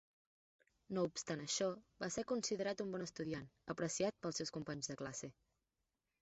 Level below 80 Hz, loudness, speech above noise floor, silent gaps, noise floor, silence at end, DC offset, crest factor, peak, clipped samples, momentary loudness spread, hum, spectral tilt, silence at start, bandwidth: -76 dBFS; -43 LUFS; 46 dB; none; -89 dBFS; 0.9 s; under 0.1%; 18 dB; -26 dBFS; under 0.1%; 8 LU; none; -4.5 dB/octave; 0.9 s; 8 kHz